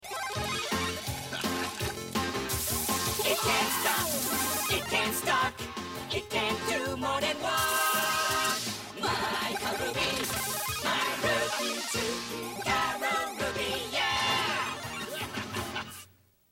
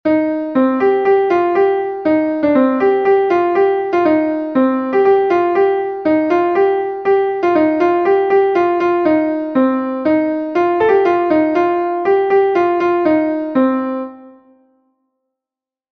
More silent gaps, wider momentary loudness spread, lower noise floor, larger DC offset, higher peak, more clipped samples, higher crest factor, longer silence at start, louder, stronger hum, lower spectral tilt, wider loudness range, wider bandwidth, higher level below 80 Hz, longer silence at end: neither; first, 9 LU vs 4 LU; second, -58 dBFS vs -89 dBFS; neither; second, -14 dBFS vs -2 dBFS; neither; about the same, 16 dB vs 12 dB; about the same, 0 s vs 0.05 s; second, -29 LUFS vs -14 LUFS; neither; second, -2 dB/octave vs -7.5 dB/octave; about the same, 2 LU vs 2 LU; first, 17 kHz vs 6.2 kHz; about the same, -54 dBFS vs -56 dBFS; second, 0.45 s vs 1.6 s